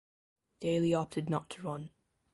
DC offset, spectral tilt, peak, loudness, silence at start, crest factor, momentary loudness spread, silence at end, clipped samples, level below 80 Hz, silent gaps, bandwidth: under 0.1%; -7 dB/octave; -18 dBFS; -35 LUFS; 0.6 s; 18 dB; 12 LU; 0.45 s; under 0.1%; -68 dBFS; none; 11.5 kHz